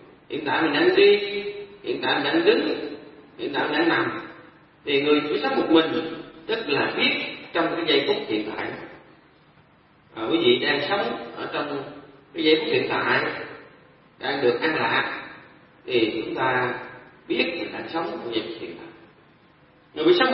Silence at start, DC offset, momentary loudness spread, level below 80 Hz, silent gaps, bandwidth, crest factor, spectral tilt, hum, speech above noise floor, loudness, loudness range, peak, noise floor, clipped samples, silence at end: 0 s; under 0.1%; 17 LU; -64 dBFS; none; 5.8 kHz; 20 dB; -9 dB/octave; none; 34 dB; -23 LUFS; 4 LU; -4 dBFS; -56 dBFS; under 0.1%; 0 s